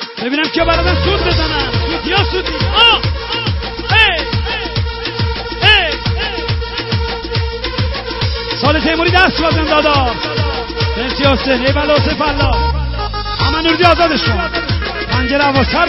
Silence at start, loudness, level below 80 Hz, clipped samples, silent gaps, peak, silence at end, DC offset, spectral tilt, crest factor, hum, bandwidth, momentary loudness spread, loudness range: 0 s; -13 LUFS; -24 dBFS; under 0.1%; none; 0 dBFS; 0 s; under 0.1%; -7 dB/octave; 14 dB; none; 7 kHz; 9 LU; 2 LU